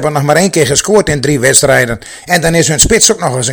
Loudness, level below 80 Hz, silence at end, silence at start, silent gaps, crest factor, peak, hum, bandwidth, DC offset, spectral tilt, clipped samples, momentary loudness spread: -9 LUFS; -30 dBFS; 0 s; 0 s; none; 10 dB; 0 dBFS; none; over 20 kHz; under 0.1%; -3 dB/octave; 2%; 7 LU